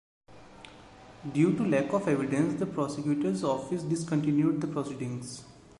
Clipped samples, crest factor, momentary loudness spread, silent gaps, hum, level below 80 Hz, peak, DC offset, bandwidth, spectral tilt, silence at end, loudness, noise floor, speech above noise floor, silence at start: under 0.1%; 16 dB; 18 LU; none; none; -64 dBFS; -12 dBFS; under 0.1%; 11.5 kHz; -7 dB/octave; 0.2 s; -29 LUFS; -51 dBFS; 23 dB; 0.3 s